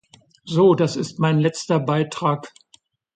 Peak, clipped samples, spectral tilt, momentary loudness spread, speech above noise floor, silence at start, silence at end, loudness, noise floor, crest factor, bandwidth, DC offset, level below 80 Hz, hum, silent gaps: -4 dBFS; under 0.1%; -6.5 dB/octave; 7 LU; 39 dB; 0.45 s; 0.65 s; -20 LUFS; -58 dBFS; 16 dB; 9.2 kHz; under 0.1%; -62 dBFS; none; none